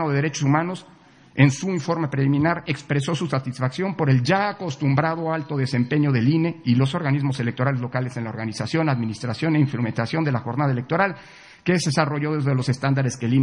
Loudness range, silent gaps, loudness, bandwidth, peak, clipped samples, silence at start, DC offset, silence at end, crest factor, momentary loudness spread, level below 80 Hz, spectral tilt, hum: 2 LU; none; -22 LUFS; 10.5 kHz; -2 dBFS; under 0.1%; 0 s; under 0.1%; 0 s; 20 dB; 7 LU; -62 dBFS; -6.5 dB/octave; none